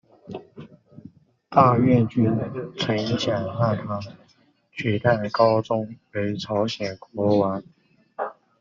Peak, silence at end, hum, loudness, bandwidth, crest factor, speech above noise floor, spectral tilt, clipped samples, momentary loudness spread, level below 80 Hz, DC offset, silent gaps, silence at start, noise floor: -4 dBFS; 0.3 s; none; -23 LUFS; 7.4 kHz; 20 dB; 39 dB; -5.5 dB/octave; under 0.1%; 16 LU; -60 dBFS; under 0.1%; none; 0.25 s; -61 dBFS